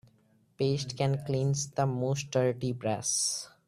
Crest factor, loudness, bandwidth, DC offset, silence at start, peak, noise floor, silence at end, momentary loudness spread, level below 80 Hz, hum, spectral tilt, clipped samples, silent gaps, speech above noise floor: 18 dB; -30 LUFS; 14.5 kHz; under 0.1%; 0.6 s; -14 dBFS; -66 dBFS; 0.2 s; 4 LU; -64 dBFS; none; -4.5 dB/octave; under 0.1%; none; 36 dB